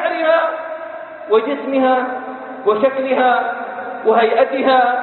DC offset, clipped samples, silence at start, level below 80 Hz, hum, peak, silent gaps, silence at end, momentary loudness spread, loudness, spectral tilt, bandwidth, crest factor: under 0.1%; under 0.1%; 0 s; -66 dBFS; none; -2 dBFS; none; 0 s; 14 LU; -16 LUFS; -9 dB/octave; 4.3 kHz; 16 dB